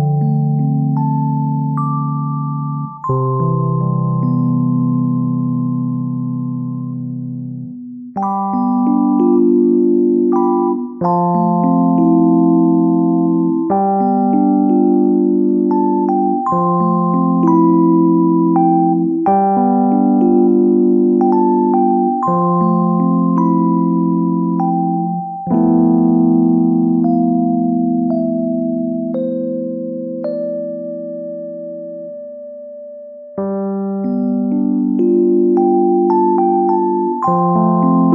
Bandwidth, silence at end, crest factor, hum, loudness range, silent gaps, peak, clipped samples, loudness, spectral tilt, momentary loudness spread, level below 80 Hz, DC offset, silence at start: 2.5 kHz; 0 s; 12 dB; 50 Hz at -55 dBFS; 8 LU; none; -2 dBFS; under 0.1%; -14 LUFS; -13.5 dB/octave; 11 LU; -58 dBFS; under 0.1%; 0 s